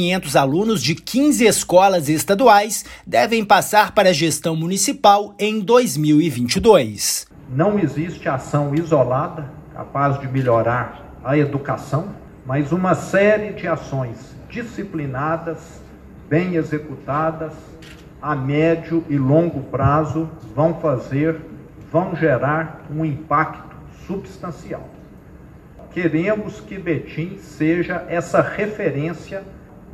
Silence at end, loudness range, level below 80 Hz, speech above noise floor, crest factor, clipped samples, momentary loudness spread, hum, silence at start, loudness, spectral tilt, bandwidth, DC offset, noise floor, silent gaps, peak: 0 s; 9 LU; -46 dBFS; 23 dB; 18 dB; under 0.1%; 16 LU; none; 0 s; -18 LUFS; -5 dB/octave; 16.5 kHz; under 0.1%; -42 dBFS; none; 0 dBFS